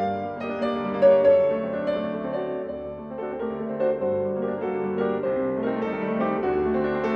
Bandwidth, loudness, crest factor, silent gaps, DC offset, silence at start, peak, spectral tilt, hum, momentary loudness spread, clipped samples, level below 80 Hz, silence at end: 5.6 kHz; -25 LUFS; 18 dB; none; under 0.1%; 0 s; -8 dBFS; -9 dB/octave; none; 12 LU; under 0.1%; -54 dBFS; 0 s